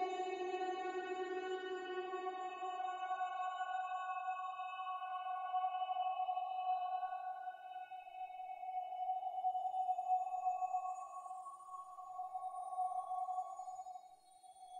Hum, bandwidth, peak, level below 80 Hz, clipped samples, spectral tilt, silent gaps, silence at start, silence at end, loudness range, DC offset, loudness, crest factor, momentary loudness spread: none; 9.6 kHz; -28 dBFS; under -90 dBFS; under 0.1%; -2 dB/octave; none; 0 s; 0 s; 3 LU; under 0.1%; -43 LUFS; 14 dB; 11 LU